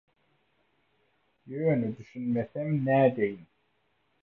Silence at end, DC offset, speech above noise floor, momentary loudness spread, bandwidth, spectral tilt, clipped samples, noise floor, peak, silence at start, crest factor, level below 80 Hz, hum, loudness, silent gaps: 0.8 s; under 0.1%; 46 dB; 13 LU; 6 kHz; -10.5 dB/octave; under 0.1%; -73 dBFS; -12 dBFS; 1.45 s; 20 dB; -70 dBFS; none; -28 LUFS; none